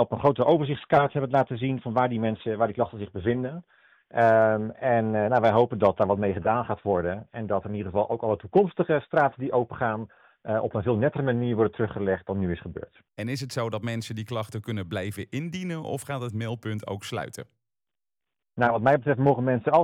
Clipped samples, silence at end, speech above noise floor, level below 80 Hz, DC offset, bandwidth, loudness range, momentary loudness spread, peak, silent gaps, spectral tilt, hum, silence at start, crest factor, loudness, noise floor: under 0.1%; 0 s; over 65 dB; -58 dBFS; under 0.1%; 15.5 kHz; 9 LU; 11 LU; -10 dBFS; none; -7.5 dB/octave; none; 0 s; 16 dB; -26 LUFS; under -90 dBFS